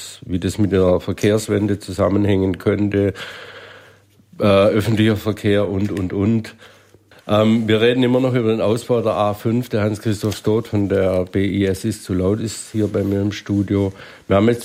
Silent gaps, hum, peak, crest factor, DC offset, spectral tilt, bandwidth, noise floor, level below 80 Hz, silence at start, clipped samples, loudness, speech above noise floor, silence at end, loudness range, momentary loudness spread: none; none; -2 dBFS; 16 dB; under 0.1%; -6.5 dB/octave; 16 kHz; -50 dBFS; -50 dBFS; 0 s; under 0.1%; -18 LUFS; 32 dB; 0 s; 2 LU; 8 LU